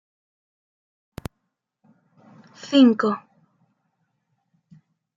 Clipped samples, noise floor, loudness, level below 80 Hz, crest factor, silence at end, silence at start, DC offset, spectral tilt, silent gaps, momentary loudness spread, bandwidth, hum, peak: under 0.1%; -78 dBFS; -19 LUFS; -60 dBFS; 22 dB; 2 s; 2.65 s; under 0.1%; -6 dB/octave; none; 26 LU; 7.6 kHz; none; -4 dBFS